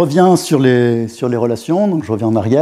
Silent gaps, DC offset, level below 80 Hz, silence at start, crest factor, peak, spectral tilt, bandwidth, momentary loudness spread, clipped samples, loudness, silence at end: none; under 0.1%; -56 dBFS; 0 s; 12 dB; 0 dBFS; -6.5 dB/octave; 15 kHz; 6 LU; under 0.1%; -14 LUFS; 0 s